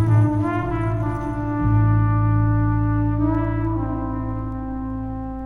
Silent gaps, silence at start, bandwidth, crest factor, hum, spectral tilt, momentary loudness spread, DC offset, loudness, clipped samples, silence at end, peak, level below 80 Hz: none; 0 s; 3.2 kHz; 14 dB; none; -10.5 dB/octave; 10 LU; under 0.1%; -22 LUFS; under 0.1%; 0 s; -6 dBFS; -30 dBFS